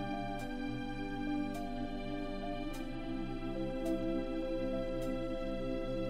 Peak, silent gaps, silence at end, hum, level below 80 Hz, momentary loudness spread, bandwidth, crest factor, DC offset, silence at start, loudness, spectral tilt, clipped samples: -24 dBFS; none; 0 s; none; -44 dBFS; 4 LU; 15 kHz; 14 dB; 0.1%; 0 s; -39 LUFS; -7 dB/octave; under 0.1%